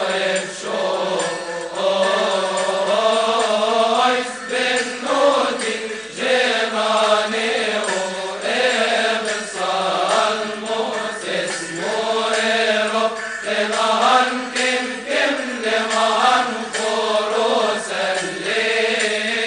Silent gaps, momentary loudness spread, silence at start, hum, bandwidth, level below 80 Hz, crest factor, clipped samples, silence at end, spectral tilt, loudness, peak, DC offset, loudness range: none; 7 LU; 0 s; none; 10 kHz; -62 dBFS; 16 dB; under 0.1%; 0 s; -2 dB/octave; -19 LUFS; -2 dBFS; under 0.1%; 2 LU